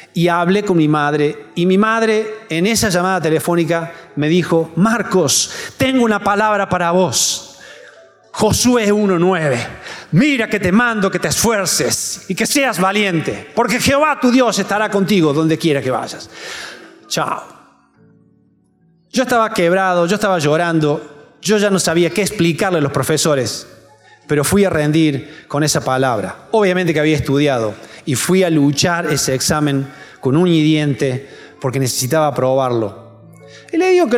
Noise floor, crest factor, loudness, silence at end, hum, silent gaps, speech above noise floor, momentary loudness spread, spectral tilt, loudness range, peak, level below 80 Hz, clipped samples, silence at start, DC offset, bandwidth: -55 dBFS; 12 dB; -15 LUFS; 0 s; none; none; 40 dB; 9 LU; -4.5 dB/octave; 3 LU; -4 dBFS; -48 dBFS; under 0.1%; 0 s; under 0.1%; 17 kHz